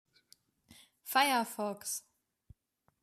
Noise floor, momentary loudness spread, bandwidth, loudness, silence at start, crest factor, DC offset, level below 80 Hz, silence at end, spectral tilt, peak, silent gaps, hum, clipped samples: -77 dBFS; 12 LU; 14.5 kHz; -33 LUFS; 0.7 s; 22 dB; under 0.1%; -74 dBFS; 1.05 s; -1.5 dB/octave; -14 dBFS; none; none; under 0.1%